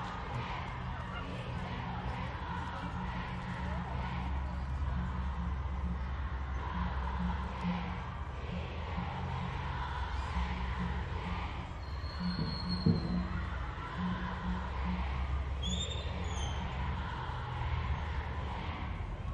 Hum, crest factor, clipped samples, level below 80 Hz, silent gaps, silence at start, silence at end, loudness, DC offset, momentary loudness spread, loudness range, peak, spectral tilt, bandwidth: none; 22 dB; under 0.1%; -40 dBFS; none; 0 s; 0 s; -38 LUFS; under 0.1%; 4 LU; 3 LU; -16 dBFS; -6 dB/octave; 8.4 kHz